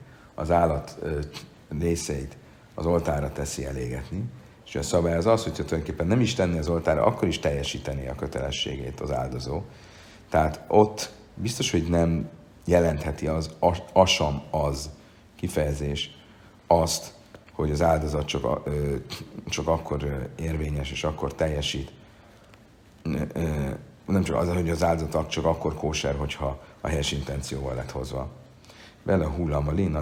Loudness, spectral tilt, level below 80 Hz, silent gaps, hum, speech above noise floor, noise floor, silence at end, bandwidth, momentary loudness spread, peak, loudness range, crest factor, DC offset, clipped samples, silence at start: -27 LUFS; -5.5 dB/octave; -40 dBFS; none; none; 27 dB; -53 dBFS; 0 s; 16.5 kHz; 12 LU; -2 dBFS; 5 LU; 24 dB; under 0.1%; under 0.1%; 0 s